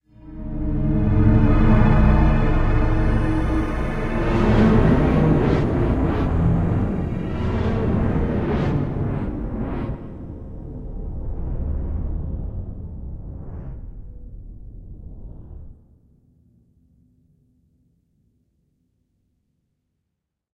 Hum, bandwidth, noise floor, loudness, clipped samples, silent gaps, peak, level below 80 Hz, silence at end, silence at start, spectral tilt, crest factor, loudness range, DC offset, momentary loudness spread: none; 6.6 kHz; -79 dBFS; -21 LUFS; under 0.1%; none; -2 dBFS; -26 dBFS; 4.85 s; 0.2 s; -9.5 dB/octave; 18 dB; 18 LU; under 0.1%; 24 LU